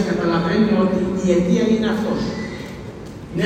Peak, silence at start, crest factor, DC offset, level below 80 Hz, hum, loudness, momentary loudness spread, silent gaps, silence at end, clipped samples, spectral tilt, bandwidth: -4 dBFS; 0 s; 14 dB; under 0.1%; -42 dBFS; none; -19 LUFS; 16 LU; none; 0 s; under 0.1%; -7 dB/octave; 9.6 kHz